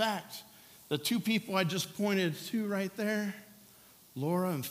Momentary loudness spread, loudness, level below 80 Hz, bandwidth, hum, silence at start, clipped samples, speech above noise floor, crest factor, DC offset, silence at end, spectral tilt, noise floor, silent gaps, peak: 16 LU; -33 LUFS; -80 dBFS; 16 kHz; none; 0 s; under 0.1%; 26 dB; 20 dB; under 0.1%; 0 s; -4.5 dB/octave; -59 dBFS; none; -14 dBFS